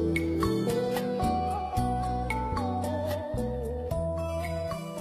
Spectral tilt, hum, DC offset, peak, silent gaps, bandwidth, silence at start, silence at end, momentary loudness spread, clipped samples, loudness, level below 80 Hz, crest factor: -6.5 dB/octave; none; under 0.1%; -14 dBFS; none; 15 kHz; 0 s; 0 s; 5 LU; under 0.1%; -30 LUFS; -40 dBFS; 16 dB